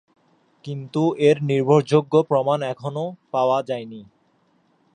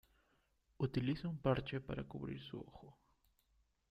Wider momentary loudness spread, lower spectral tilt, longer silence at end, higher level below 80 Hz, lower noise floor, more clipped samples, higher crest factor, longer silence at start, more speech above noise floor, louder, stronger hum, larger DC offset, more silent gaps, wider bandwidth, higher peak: about the same, 16 LU vs 14 LU; about the same, -7.5 dB/octave vs -8.5 dB/octave; about the same, 0.9 s vs 1 s; second, -70 dBFS vs -62 dBFS; second, -63 dBFS vs -78 dBFS; neither; about the same, 20 dB vs 22 dB; second, 0.65 s vs 0.8 s; first, 43 dB vs 37 dB; first, -21 LUFS vs -42 LUFS; neither; neither; neither; first, 9.8 kHz vs 6 kHz; first, -2 dBFS vs -22 dBFS